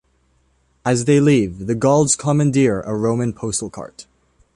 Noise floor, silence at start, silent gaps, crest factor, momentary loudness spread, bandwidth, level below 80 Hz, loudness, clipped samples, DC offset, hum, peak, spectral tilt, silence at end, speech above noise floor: -61 dBFS; 0.85 s; none; 16 dB; 11 LU; 11.5 kHz; -48 dBFS; -17 LUFS; under 0.1%; under 0.1%; none; -2 dBFS; -5.5 dB/octave; 0.55 s; 44 dB